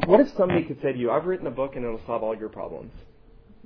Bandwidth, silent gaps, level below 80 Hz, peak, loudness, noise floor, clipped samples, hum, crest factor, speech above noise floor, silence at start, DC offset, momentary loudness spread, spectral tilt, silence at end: 5.4 kHz; none; -48 dBFS; -4 dBFS; -25 LUFS; -50 dBFS; under 0.1%; none; 20 dB; 26 dB; 0 s; under 0.1%; 16 LU; -9 dB/octave; 0.3 s